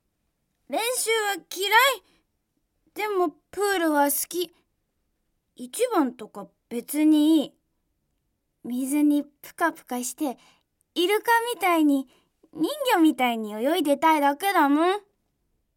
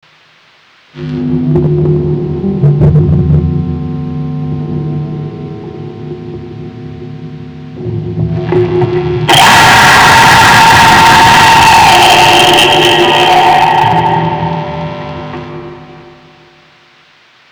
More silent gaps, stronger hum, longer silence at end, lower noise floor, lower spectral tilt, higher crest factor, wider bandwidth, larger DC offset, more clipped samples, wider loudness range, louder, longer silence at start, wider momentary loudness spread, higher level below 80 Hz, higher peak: neither; neither; second, 0.75 s vs 1.55 s; first, -75 dBFS vs -44 dBFS; second, -2 dB/octave vs -4 dB/octave; first, 20 dB vs 8 dB; second, 17 kHz vs over 20 kHz; neither; neither; second, 5 LU vs 18 LU; second, -24 LUFS vs -6 LUFS; second, 0.7 s vs 0.95 s; second, 16 LU vs 22 LU; second, -74 dBFS vs -30 dBFS; second, -4 dBFS vs 0 dBFS